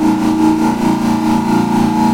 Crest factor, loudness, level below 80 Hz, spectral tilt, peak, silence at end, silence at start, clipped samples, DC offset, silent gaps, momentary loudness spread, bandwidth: 10 dB; -13 LUFS; -40 dBFS; -6.5 dB/octave; -2 dBFS; 0 s; 0 s; under 0.1%; under 0.1%; none; 2 LU; 16.5 kHz